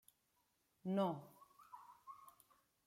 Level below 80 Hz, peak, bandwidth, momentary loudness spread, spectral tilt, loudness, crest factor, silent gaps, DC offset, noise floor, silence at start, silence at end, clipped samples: under -90 dBFS; -28 dBFS; 16 kHz; 24 LU; -7.5 dB/octave; -43 LUFS; 20 dB; none; under 0.1%; -82 dBFS; 0.85 s; 0.55 s; under 0.1%